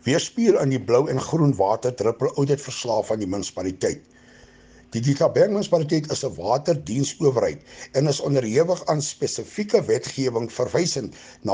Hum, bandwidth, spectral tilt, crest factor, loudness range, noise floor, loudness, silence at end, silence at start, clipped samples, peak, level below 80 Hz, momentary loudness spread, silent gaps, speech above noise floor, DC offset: none; 10 kHz; -5.5 dB/octave; 18 dB; 3 LU; -50 dBFS; -23 LUFS; 0 s; 0.05 s; under 0.1%; -6 dBFS; -58 dBFS; 8 LU; none; 28 dB; under 0.1%